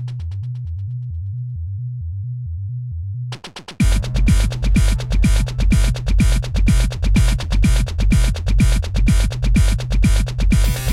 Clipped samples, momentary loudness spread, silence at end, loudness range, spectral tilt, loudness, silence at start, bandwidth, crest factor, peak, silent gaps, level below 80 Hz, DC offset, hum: under 0.1%; 10 LU; 0 s; 9 LU; -5.5 dB/octave; -19 LUFS; 0 s; 14 kHz; 12 dB; -4 dBFS; none; -18 dBFS; under 0.1%; none